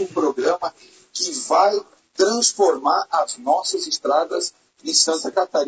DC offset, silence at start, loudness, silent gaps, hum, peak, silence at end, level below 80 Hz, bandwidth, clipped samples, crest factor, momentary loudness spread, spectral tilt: under 0.1%; 0 s; -20 LUFS; none; none; -2 dBFS; 0 s; -72 dBFS; 8 kHz; under 0.1%; 18 dB; 11 LU; -1 dB/octave